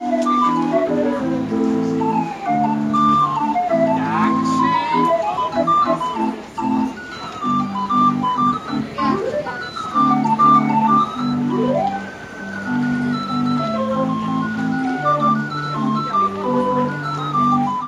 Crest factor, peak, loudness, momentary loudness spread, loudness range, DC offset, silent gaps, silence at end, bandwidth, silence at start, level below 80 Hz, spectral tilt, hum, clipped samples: 16 dB; -2 dBFS; -18 LUFS; 8 LU; 3 LU; under 0.1%; none; 0 s; 10.5 kHz; 0 s; -56 dBFS; -6.5 dB/octave; none; under 0.1%